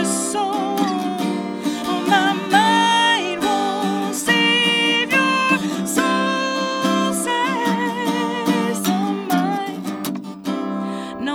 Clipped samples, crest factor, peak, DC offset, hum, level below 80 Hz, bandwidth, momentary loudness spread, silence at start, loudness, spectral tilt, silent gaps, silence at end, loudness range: under 0.1%; 18 dB; -2 dBFS; under 0.1%; none; -62 dBFS; 19 kHz; 10 LU; 0 s; -19 LUFS; -3.5 dB/octave; none; 0 s; 5 LU